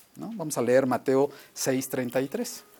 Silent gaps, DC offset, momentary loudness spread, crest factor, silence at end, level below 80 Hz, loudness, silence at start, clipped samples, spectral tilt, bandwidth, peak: none; under 0.1%; 10 LU; 18 dB; 0.2 s; -72 dBFS; -27 LUFS; 0.15 s; under 0.1%; -4.5 dB/octave; 19.5 kHz; -10 dBFS